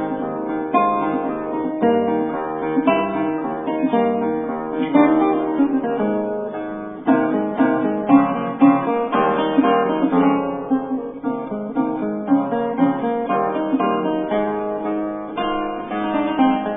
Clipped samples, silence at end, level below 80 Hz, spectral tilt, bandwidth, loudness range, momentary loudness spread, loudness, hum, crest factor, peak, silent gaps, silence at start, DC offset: under 0.1%; 0 s; -54 dBFS; -11 dB/octave; 3.8 kHz; 4 LU; 9 LU; -20 LUFS; none; 18 dB; -2 dBFS; none; 0 s; under 0.1%